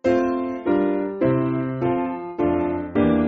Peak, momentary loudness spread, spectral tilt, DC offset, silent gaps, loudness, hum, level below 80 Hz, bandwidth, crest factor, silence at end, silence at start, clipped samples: -6 dBFS; 4 LU; -7.5 dB/octave; under 0.1%; none; -22 LUFS; none; -48 dBFS; 7 kHz; 14 dB; 0 s; 0.05 s; under 0.1%